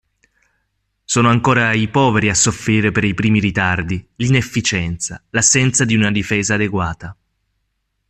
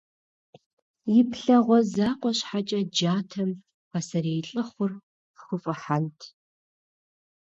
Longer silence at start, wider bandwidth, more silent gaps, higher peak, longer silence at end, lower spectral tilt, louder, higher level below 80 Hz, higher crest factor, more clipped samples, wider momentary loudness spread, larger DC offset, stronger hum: about the same, 1.1 s vs 1.05 s; first, 13.5 kHz vs 8 kHz; second, none vs 3.74-3.91 s, 5.03-5.34 s; first, 0 dBFS vs -8 dBFS; second, 0.95 s vs 1.15 s; second, -4 dB/octave vs -6 dB/octave; first, -16 LUFS vs -26 LUFS; first, -44 dBFS vs -70 dBFS; about the same, 16 dB vs 18 dB; neither; second, 9 LU vs 13 LU; neither; neither